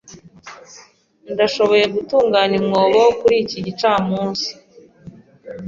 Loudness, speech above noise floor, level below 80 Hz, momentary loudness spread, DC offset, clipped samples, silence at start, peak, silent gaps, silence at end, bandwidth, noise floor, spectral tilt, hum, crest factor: -16 LUFS; 33 dB; -56 dBFS; 12 LU; under 0.1%; under 0.1%; 0.1 s; -2 dBFS; none; 0 s; 7.4 kHz; -49 dBFS; -5 dB/octave; none; 16 dB